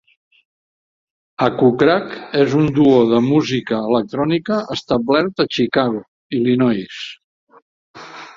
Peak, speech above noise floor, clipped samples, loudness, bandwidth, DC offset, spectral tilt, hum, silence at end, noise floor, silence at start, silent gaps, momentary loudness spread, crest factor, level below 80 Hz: 0 dBFS; over 74 dB; under 0.1%; -17 LUFS; 7.6 kHz; under 0.1%; -7 dB/octave; none; 0.05 s; under -90 dBFS; 1.4 s; 6.08-6.30 s, 7.24-7.47 s, 7.62-7.94 s; 14 LU; 18 dB; -54 dBFS